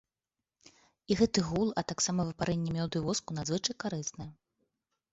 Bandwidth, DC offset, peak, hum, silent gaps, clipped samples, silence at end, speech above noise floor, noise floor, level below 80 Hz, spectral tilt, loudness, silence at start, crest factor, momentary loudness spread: 8 kHz; under 0.1%; -12 dBFS; none; none; under 0.1%; 0.8 s; over 58 dB; under -90 dBFS; -58 dBFS; -4.5 dB/octave; -32 LUFS; 1.1 s; 20 dB; 9 LU